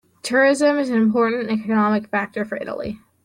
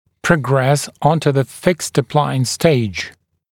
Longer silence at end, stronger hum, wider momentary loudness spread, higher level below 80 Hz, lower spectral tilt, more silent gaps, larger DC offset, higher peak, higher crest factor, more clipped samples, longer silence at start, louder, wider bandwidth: second, 0.25 s vs 0.4 s; neither; first, 11 LU vs 4 LU; second, -58 dBFS vs -48 dBFS; about the same, -5.5 dB/octave vs -5.5 dB/octave; neither; neither; second, -6 dBFS vs 0 dBFS; about the same, 14 dB vs 16 dB; neither; about the same, 0.25 s vs 0.25 s; second, -20 LUFS vs -17 LUFS; second, 12 kHz vs 17 kHz